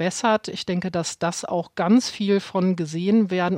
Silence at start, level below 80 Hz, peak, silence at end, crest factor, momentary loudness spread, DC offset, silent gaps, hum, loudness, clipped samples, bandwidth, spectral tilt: 0 s; -64 dBFS; -8 dBFS; 0 s; 14 dB; 7 LU; under 0.1%; none; none; -23 LUFS; under 0.1%; 12 kHz; -5.5 dB/octave